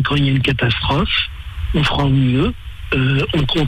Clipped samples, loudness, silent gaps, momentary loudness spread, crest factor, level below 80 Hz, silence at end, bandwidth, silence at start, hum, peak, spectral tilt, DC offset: under 0.1%; -17 LUFS; none; 7 LU; 10 dB; -28 dBFS; 0 s; 9.6 kHz; 0 s; none; -6 dBFS; -7 dB/octave; under 0.1%